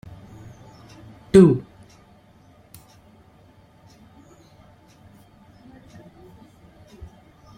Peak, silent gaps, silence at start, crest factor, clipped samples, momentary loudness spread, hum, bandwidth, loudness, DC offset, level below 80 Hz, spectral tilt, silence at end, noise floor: -2 dBFS; none; 1.35 s; 24 dB; under 0.1%; 32 LU; none; 10.5 kHz; -16 LUFS; under 0.1%; -52 dBFS; -8 dB/octave; 5.95 s; -53 dBFS